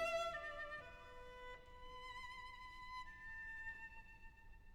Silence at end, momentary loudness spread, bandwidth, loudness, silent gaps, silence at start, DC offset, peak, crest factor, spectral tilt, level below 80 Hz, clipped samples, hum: 0 s; 14 LU; 18 kHz; -51 LUFS; none; 0 s; under 0.1%; -32 dBFS; 18 dB; -2.5 dB/octave; -62 dBFS; under 0.1%; none